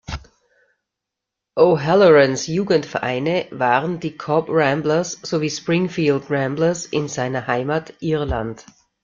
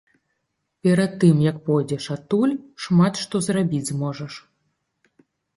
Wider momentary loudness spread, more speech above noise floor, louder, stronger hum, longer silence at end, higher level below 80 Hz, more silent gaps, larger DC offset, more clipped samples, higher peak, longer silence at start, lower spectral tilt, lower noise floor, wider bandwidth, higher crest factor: about the same, 11 LU vs 12 LU; first, 65 dB vs 55 dB; about the same, -19 LUFS vs -21 LUFS; neither; second, 0.4 s vs 1.15 s; first, -44 dBFS vs -60 dBFS; neither; neither; neither; about the same, -2 dBFS vs -4 dBFS; second, 0.1 s vs 0.85 s; about the same, -5.5 dB/octave vs -6.5 dB/octave; first, -83 dBFS vs -76 dBFS; second, 7.6 kHz vs 11.5 kHz; about the same, 18 dB vs 18 dB